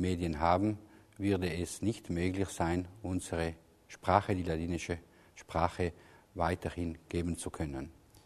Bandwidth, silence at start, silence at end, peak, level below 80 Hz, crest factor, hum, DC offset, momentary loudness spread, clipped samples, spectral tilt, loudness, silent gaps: 13.5 kHz; 0 s; 0.05 s; -10 dBFS; -52 dBFS; 24 dB; none; under 0.1%; 11 LU; under 0.1%; -6 dB/octave; -35 LUFS; none